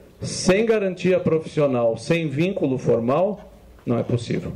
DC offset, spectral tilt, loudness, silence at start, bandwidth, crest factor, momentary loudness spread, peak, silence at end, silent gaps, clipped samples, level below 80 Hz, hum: under 0.1%; -6 dB/octave; -21 LUFS; 0.2 s; 12 kHz; 12 dB; 6 LU; -10 dBFS; 0 s; none; under 0.1%; -50 dBFS; none